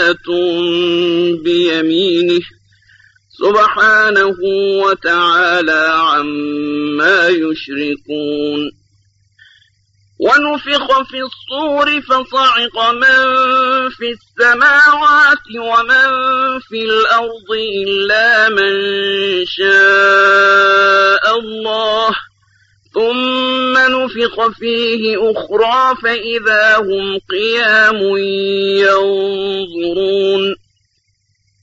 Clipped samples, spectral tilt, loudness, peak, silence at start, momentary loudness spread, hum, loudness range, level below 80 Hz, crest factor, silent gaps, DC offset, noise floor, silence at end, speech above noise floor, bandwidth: under 0.1%; -3.5 dB/octave; -12 LUFS; 0 dBFS; 0 s; 11 LU; none; 6 LU; -54 dBFS; 12 dB; none; under 0.1%; -62 dBFS; 1.05 s; 49 dB; 8 kHz